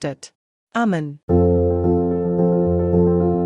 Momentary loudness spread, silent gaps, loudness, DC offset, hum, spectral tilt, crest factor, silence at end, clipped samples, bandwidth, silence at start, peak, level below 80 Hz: 9 LU; 0.35-0.67 s, 1.23-1.28 s; -18 LUFS; under 0.1%; none; -9 dB/octave; 14 dB; 0 s; under 0.1%; 9.2 kHz; 0 s; -6 dBFS; -42 dBFS